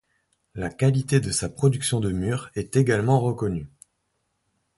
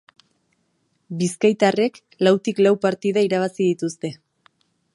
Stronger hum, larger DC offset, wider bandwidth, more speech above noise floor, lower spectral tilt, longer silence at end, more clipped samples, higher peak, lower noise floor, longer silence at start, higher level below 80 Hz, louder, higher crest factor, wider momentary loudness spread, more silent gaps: neither; neither; about the same, 11.5 kHz vs 11.5 kHz; about the same, 52 dB vs 49 dB; about the same, -6 dB/octave vs -5.5 dB/octave; first, 1.1 s vs 0.8 s; neither; about the same, -6 dBFS vs -4 dBFS; first, -74 dBFS vs -68 dBFS; second, 0.55 s vs 1.1 s; first, -48 dBFS vs -72 dBFS; second, -24 LUFS vs -20 LUFS; about the same, 18 dB vs 18 dB; first, 13 LU vs 9 LU; neither